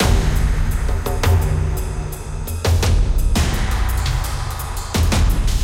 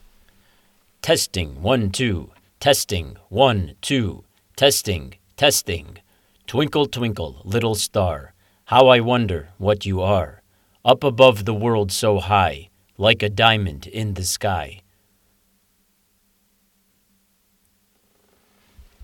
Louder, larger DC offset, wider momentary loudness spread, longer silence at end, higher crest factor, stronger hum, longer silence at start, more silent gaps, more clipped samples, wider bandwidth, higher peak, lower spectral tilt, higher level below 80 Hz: about the same, -20 LUFS vs -19 LUFS; neither; second, 9 LU vs 14 LU; about the same, 0 s vs 0 s; second, 14 dB vs 22 dB; neither; second, 0 s vs 1.05 s; neither; neither; about the same, 16.5 kHz vs 17.5 kHz; about the same, -2 dBFS vs 0 dBFS; about the same, -5 dB/octave vs -4 dB/octave; first, -18 dBFS vs -44 dBFS